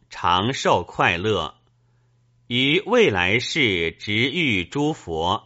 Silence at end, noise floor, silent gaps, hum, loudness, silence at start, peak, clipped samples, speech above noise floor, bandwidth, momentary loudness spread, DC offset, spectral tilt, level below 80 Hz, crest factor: 0.05 s; -61 dBFS; none; none; -20 LUFS; 0.1 s; -2 dBFS; under 0.1%; 40 dB; 8 kHz; 7 LU; under 0.1%; -2.5 dB/octave; -50 dBFS; 20 dB